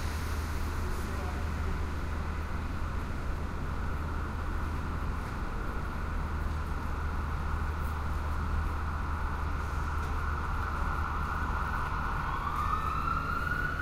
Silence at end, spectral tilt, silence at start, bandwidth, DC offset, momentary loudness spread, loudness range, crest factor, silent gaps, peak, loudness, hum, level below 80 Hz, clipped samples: 0 s; -6 dB/octave; 0 s; 15.5 kHz; under 0.1%; 5 LU; 3 LU; 14 dB; none; -18 dBFS; -35 LUFS; none; -34 dBFS; under 0.1%